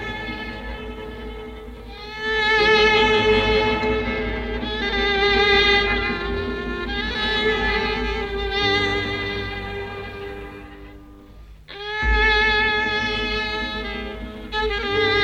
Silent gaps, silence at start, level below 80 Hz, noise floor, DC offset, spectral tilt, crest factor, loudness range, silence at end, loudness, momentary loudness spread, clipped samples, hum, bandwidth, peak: none; 0 s; -34 dBFS; -43 dBFS; under 0.1%; -4.5 dB/octave; 16 dB; 7 LU; 0 s; -20 LUFS; 19 LU; under 0.1%; none; 8.8 kHz; -6 dBFS